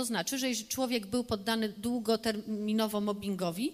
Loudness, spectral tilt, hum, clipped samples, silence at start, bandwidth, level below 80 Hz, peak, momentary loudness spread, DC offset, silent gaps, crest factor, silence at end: -32 LUFS; -4 dB/octave; none; under 0.1%; 0 s; 15.5 kHz; -64 dBFS; -16 dBFS; 3 LU; under 0.1%; none; 16 dB; 0 s